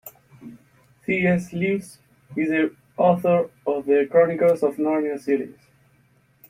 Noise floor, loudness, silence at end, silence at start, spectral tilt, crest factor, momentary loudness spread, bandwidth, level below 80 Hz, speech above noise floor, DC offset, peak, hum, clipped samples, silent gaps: -60 dBFS; -22 LUFS; 1 s; 0.05 s; -7.5 dB/octave; 18 dB; 9 LU; 16 kHz; -64 dBFS; 39 dB; under 0.1%; -4 dBFS; none; under 0.1%; none